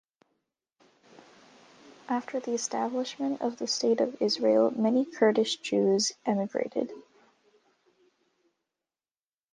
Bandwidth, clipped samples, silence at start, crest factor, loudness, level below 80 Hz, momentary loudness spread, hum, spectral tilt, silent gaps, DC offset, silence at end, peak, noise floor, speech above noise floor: 10 kHz; under 0.1%; 1.85 s; 20 dB; -28 LUFS; -80 dBFS; 8 LU; none; -4 dB/octave; none; under 0.1%; 2.55 s; -10 dBFS; under -90 dBFS; over 63 dB